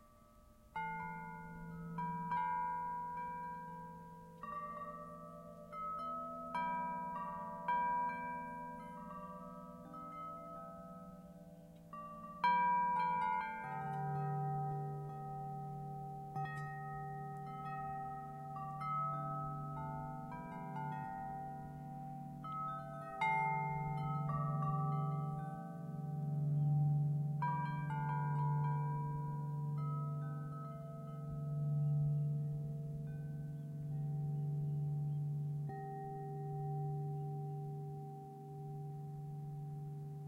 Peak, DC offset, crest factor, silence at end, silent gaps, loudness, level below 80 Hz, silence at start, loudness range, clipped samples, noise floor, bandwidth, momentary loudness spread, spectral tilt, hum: -24 dBFS; under 0.1%; 18 dB; 0 s; none; -41 LUFS; -68 dBFS; 0 s; 8 LU; under 0.1%; -63 dBFS; 4.4 kHz; 14 LU; -8.5 dB/octave; none